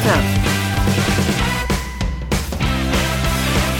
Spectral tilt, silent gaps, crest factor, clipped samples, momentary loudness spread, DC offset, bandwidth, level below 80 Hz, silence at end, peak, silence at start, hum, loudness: -4.5 dB/octave; none; 16 dB; under 0.1%; 5 LU; under 0.1%; 19 kHz; -24 dBFS; 0 s; 0 dBFS; 0 s; none; -18 LUFS